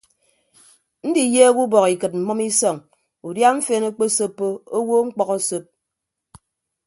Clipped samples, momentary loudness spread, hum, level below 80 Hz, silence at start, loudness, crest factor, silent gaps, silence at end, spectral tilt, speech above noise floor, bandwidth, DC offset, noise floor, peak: under 0.1%; 13 LU; none; -68 dBFS; 1.05 s; -19 LUFS; 20 dB; none; 1.25 s; -3.5 dB/octave; 63 dB; 12 kHz; under 0.1%; -81 dBFS; 0 dBFS